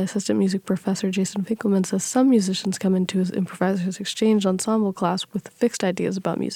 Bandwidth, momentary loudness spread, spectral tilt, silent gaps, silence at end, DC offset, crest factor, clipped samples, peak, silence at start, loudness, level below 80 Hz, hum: 15 kHz; 6 LU; -5.5 dB/octave; none; 0 s; under 0.1%; 16 dB; under 0.1%; -6 dBFS; 0 s; -23 LUFS; -66 dBFS; none